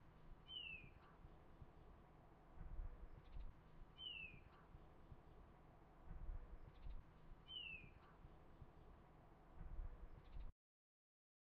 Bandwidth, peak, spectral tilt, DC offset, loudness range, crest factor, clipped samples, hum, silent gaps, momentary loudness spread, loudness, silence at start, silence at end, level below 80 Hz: 5 kHz; -40 dBFS; -2.5 dB/octave; under 0.1%; 4 LU; 18 dB; under 0.1%; none; none; 16 LU; -60 LUFS; 0 s; 1 s; -60 dBFS